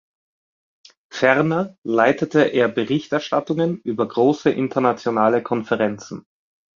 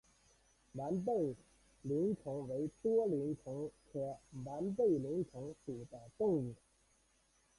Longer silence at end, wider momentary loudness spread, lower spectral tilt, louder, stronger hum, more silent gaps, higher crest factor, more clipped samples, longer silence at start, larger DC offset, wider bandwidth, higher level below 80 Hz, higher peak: second, 0.55 s vs 1.05 s; second, 7 LU vs 14 LU; second, -6.5 dB/octave vs -9 dB/octave; first, -20 LUFS vs -39 LUFS; neither; first, 1.78-1.82 s vs none; about the same, 18 dB vs 16 dB; neither; first, 1.15 s vs 0.75 s; neither; second, 7.4 kHz vs 11.5 kHz; first, -64 dBFS vs -70 dBFS; first, -2 dBFS vs -24 dBFS